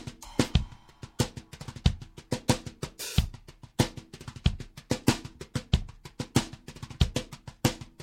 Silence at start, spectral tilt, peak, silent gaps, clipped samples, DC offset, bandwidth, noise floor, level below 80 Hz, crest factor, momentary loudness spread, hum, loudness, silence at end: 0 s; -5 dB/octave; -6 dBFS; none; under 0.1%; under 0.1%; 16 kHz; -49 dBFS; -38 dBFS; 24 dB; 16 LU; none; -31 LUFS; 0 s